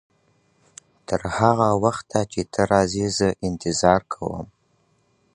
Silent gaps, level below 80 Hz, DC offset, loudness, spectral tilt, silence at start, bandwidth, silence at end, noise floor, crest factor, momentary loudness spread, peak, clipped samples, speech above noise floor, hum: none; -46 dBFS; under 0.1%; -22 LUFS; -5 dB/octave; 1.1 s; 11 kHz; 0.9 s; -65 dBFS; 22 dB; 12 LU; -2 dBFS; under 0.1%; 44 dB; none